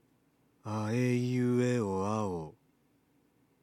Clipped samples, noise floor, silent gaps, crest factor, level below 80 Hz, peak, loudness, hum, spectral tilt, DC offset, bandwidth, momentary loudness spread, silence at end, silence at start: under 0.1%; -70 dBFS; none; 14 dB; -74 dBFS; -18 dBFS; -32 LUFS; none; -7 dB/octave; under 0.1%; 14.5 kHz; 12 LU; 1.1 s; 0.65 s